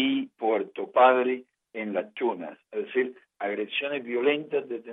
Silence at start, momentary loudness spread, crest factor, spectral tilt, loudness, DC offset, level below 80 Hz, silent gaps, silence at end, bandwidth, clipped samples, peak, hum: 0 s; 15 LU; 20 dB; -7.5 dB/octave; -27 LUFS; under 0.1%; under -90 dBFS; none; 0 s; 3.9 kHz; under 0.1%; -6 dBFS; none